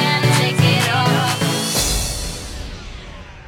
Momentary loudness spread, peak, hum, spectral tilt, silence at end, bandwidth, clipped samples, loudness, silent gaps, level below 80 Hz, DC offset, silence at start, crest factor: 19 LU; -2 dBFS; none; -4 dB/octave; 0 s; 18 kHz; under 0.1%; -17 LUFS; none; -32 dBFS; under 0.1%; 0 s; 16 dB